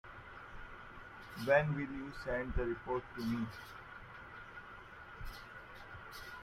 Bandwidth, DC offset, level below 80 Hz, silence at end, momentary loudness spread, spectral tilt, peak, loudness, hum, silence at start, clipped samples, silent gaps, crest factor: 15.5 kHz; under 0.1%; -52 dBFS; 0 s; 20 LU; -7 dB/octave; -16 dBFS; -39 LUFS; none; 0.05 s; under 0.1%; none; 24 dB